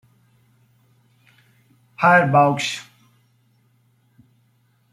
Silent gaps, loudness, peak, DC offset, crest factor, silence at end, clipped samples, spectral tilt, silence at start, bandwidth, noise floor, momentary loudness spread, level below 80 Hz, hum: none; -17 LUFS; -2 dBFS; under 0.1%; 22 dB; 2.1 s; under 0.1%; -5 dB/octave; 2 s; 13.5 kHz; -62 dBFS; 12 LU; -66 dBFS; none